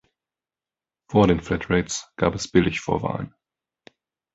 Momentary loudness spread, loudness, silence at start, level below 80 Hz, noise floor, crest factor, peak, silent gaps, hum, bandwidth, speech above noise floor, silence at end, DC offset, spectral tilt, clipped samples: 11 LU; -23 LUFS; 1.1 s; -44 dBFS; under -90 dBFS; 22 dB; -2 dBFS; none; none; 8.2 kHz; over 68 dB; 1.05 s; under 0.1%; -5.5 dB/octave; under 0.1%